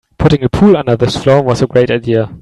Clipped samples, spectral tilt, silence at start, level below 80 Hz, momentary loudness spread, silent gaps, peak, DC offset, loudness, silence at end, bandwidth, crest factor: under 0.1%; -7 dB/octave; 0.2 s; -32 dBFS; 4 LU; none; 0 dBFS; 0.2%; -11 LUFS; 0.05 s; 11.5 kHz; 10 dB